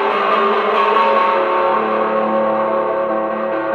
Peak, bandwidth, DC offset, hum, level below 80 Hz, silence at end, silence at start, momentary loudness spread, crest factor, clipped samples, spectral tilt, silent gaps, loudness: -2 dBFS; 6.6 kHz; under 0.1%; none; -62 dBFS; 0 s; 0 s; 5 LU; 14 dB; under 0.1%; -6 dB/octave; none; -16 LUFS